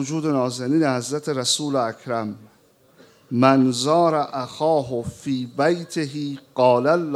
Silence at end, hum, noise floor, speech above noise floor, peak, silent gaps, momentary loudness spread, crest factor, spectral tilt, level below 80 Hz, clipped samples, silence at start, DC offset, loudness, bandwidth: 0 s; none; -56 dBFS; 35 dB; -2 dBFS; none; 11 LU; 20 dB; -5 dB/octave; -62 dBFS; under 0.1%; 0 s; under 0.1%; -21 LUFS; 14 kHz